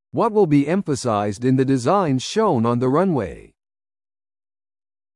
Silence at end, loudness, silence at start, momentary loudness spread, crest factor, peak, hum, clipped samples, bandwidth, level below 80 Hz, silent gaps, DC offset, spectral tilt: 1.75 s; -19 LUFS; 0.15 s; 5 LU; 16 dB; -4 dBFS; none; under 0.1%; 11.5 kHz; -54 dBFS; none; under 0.1%; -6.5 dB/octave